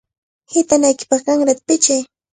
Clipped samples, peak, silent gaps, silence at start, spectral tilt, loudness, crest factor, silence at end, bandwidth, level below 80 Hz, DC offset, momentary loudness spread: under 0.1%; 0 dBFS; none; 0.5 s; -2 dB/octave; -15 LUFS; 16 dB; 0.3 s; 9.6 kHz; -62 dBFS; under 0.1%; 6 LU